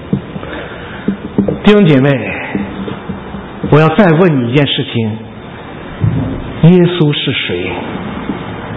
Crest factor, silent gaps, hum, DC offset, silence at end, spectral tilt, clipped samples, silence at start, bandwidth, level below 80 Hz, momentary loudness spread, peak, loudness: 12 dB; none; none; under 0.1%; 0 s; -9 dB/octave; 0.3%; 0 s; 5.2 kHz; -36 dBFS; 17 LU; 0 dBFS; -12 LUFS